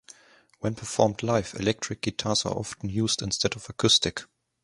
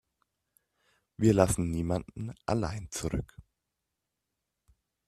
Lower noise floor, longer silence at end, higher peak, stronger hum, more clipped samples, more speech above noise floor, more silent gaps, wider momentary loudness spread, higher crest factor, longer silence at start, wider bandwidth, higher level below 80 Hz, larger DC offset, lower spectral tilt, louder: second, -54 dBFS vs -85 dBFS; second, 0.4 s vs 1.65 s; about the same, -4 dBFS vs -6 dBFS; neither; neither; second, 28 dB vs 56 dB; neither; second, 11 LU vs 14 LU; about the same, 24 dB vs 28 dB; second, 0.6 s vs 1.2 s; second, 11.5 kHz vs 14 kHz; about the same, -52 dBFS vs -50 dBFS; neither; second, -3.5 dB/octave vs -6 dB/octave; first, -26 LUFS vs -30 LUFS